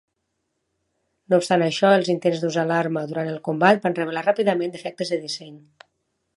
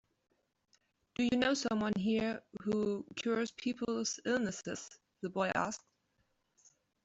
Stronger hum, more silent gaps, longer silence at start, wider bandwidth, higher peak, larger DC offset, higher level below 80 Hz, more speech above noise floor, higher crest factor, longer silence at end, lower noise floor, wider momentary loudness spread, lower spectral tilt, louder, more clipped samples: neither; neither; about the same, 1.3 s vs 1.2 s; first, 11.5 kHz vs 8 kHz; first, -2 dBFS vs -18 dBFS; neither; second, -74 dBFS vs -68 dBFS; first, 55 dB vs 44 dB; about the same, 22 dB vs 20 dB; second, 0.8 s vs 1.25 s; about the same, -76 dBFS vs -79 dBFS; about the same, 10 LU vs 12 LU; first, -5.5 dB/octave vs -4 dB/octave; first, -21 LUFS vs -36 LUFS; neither